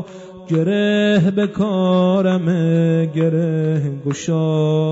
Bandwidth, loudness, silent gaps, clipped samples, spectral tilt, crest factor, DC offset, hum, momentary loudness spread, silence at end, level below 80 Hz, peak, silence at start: 8 kHz; -17 LUFS; none; under 0.1%; -7.5 dB/octave; 10 dB; under 0.1%; none; 6 LU; 0 s; -56 dBFS; -6 dBFS; 0 s